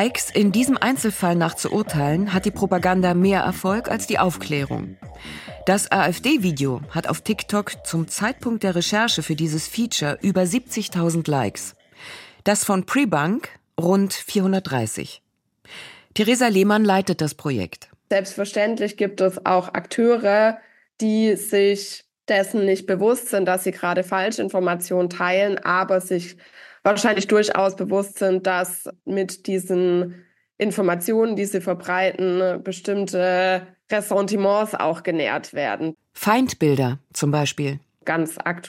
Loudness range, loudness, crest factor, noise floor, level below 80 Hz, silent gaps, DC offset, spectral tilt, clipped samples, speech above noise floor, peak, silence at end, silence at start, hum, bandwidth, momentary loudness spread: 2 LU; -21 LUFS; 20 dB; -41 dBFS; -54 dBFS; none; under 0.1%; -5 dB/octave; under 0.1%; 20 dB; -2 dBFS; 0 s; 0 s; none; 16.5 kHz; 9 LU